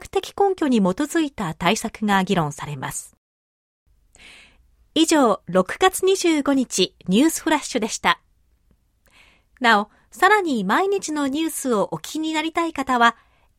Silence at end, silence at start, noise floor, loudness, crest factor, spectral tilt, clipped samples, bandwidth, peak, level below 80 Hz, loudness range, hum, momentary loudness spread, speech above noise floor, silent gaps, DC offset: 0.45 s; 0 s; -62 dBFS; -20 LUFS; 20 dB; -4 dB/octave; under 0.1%; 16.5 kHz; -2 dBFS; -54 dBFS; 5 LU; none; 8 LU; 42 dB; 3.17-3.86 s; under 0.1%